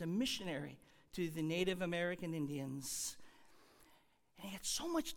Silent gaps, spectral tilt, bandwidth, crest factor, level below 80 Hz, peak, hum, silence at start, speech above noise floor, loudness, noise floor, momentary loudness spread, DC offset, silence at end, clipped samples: none; -4 dB/octave; 19 kHz; 18 dB; -66 dBFS; -24 dBFS; none; 0 s; 29 dB; -41 LUFS; -70 dBFS; 14 LU; under 0.1%; 0 s; under 0.1%